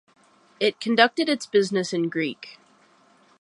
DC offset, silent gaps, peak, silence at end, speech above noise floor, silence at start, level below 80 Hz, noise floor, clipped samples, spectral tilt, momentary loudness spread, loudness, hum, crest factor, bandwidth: under 0.1%; none; -2 dBFS; 0.9 s; 35 dB; 0.6 s; -76 dBFS; -58 dBFS; under 0.1%; -4 dB/octave; 11 LU; -23 LUFS; none; 24 dB; 11.5 kHz